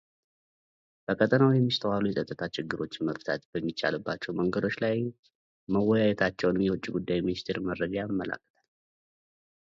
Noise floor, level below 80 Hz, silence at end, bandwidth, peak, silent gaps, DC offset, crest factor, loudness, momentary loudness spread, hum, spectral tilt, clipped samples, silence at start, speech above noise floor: under -90 dBFS; -60 dBFS; 1.25 s; 7.6 kHz; -8 dBFS; 3.45-3.53 s, 5.19-5.23 s, 5.35-5.67 s; under 0.1%; 20 dB; -29 LUFS; 10 LU; none; -7 dB/octave; under 0.1%; 1.1 s; over 62 dB